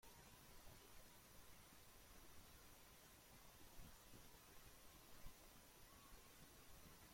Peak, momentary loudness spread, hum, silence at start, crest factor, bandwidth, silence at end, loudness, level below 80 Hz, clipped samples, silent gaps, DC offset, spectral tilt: -46 dBFS; 1 LU; none; 0 s; 18 dB; 16.5 kHz; 0 s; -65 LUFS; -70 dBFS; under 0.1%; none; under 0.1%; -3 dB/octave